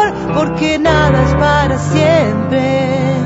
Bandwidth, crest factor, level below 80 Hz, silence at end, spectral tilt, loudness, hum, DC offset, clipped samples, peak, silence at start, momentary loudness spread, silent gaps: 8 kHz; 12 dB; -28 dBFS; 0 s; -6.5 dB/octave; -12 LUFS; none; under 0.1%; under 0.1%; 0 dBFS; 0 s; 4 LU; none